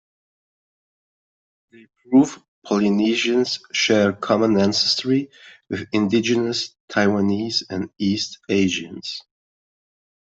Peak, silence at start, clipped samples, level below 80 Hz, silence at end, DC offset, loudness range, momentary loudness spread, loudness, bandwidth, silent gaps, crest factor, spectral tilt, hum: -4 dBFS; 2.1 s; under 0.1%; -62 dBFS; 1 s; under 0.1%; 4 LU; 13 LU; -20 LUFS; 8 kHz; 2.48-2.62 s, 6.80-6.88 s; 18 dB; -4.5 dB/octave; none